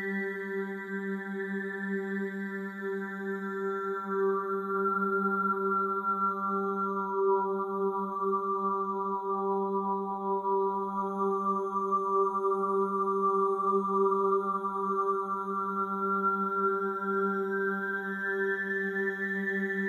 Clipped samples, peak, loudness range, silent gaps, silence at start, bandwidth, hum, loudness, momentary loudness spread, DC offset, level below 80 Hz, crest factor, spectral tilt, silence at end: under 0.1%; -16 dBFS; 5 LU; none; 0 s; 6.8 kHz; none; -30 LUFS; 7 LU; under 0.1%; under -90 dBFS; 14 dB; -8.5 dB/octave; 0 s